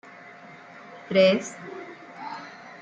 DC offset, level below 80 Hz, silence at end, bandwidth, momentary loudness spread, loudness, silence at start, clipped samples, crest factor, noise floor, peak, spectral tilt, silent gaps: under 0.1%; -76 dBFS; 0.1 s; 8.6 kHz; 25 LU; -23 LUFS; 0.9 s; under 0.1%; 20 dB; -46 dBFS; -8 dBFS; -5 dB/octave; none